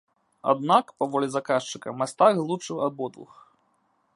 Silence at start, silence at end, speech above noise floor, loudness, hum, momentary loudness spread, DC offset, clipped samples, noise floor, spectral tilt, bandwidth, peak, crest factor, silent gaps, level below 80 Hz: 0.45 s; 0.9 s; 44 dB; -25 LUFS; none; 11 LU; under 0.1%; under 0.1%; -69 dBFS; -5 dB/octave; 11.5 kHz; -4 dBFS; 22 dB; none; -76 dBFS